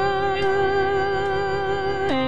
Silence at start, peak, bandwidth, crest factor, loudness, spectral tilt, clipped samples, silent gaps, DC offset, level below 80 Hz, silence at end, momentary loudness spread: 0 s; -12 dBFS; 9.2 kHz; 12 dB; -22 LUFS; -6 dB/octave; under 0.1%; none; 2%; -44 dBFS; 0 s; 3 LU